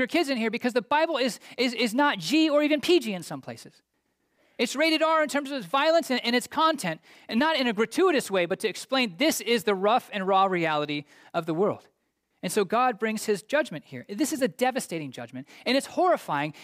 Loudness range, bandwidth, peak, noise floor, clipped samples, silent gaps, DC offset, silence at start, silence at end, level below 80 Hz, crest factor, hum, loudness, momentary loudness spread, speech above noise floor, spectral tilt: 3 LU; 16 kHz; -12 dBFS; -75 dBFS; under 0.1%; none; under 0.1%; 0 s; 0 s; -74 dBFS; 14 dB; none; -25 LUFS; 11 LU; 49 dB; -3.5 dB/octave